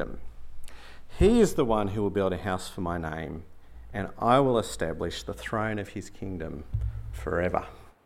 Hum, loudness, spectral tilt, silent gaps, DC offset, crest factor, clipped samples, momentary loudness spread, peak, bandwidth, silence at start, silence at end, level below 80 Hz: none; -28 LUFS; -6 dB/octave; none; under 0.1%; 22 dB; under 0.1%; 16 LU; -6 dBFS; 16 kHz; 0 s; 0.15 s; -40 dBFS